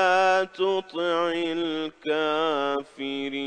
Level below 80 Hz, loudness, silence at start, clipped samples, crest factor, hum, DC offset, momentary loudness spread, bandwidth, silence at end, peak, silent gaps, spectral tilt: -72 dBFS; -25 LUFS; 0 s; under 0.1%; 16 dB; none; 0.2%; 9 LU; 9.6 kHz; 0 s; -8 dBFS; none; -4 dB/octave